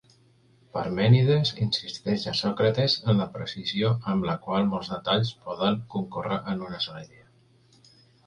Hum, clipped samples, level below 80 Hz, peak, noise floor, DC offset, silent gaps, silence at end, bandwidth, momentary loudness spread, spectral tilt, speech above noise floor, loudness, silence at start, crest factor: none; under 0.1%; -58 dBFS; -8 dBFS; -60 dBFS; under 0.1%; none; 1.2 s; 9.6 kHz; 11 LU; -7 dB/octave; 35 dB; -26 LUFS; 0.75 s; 18 dB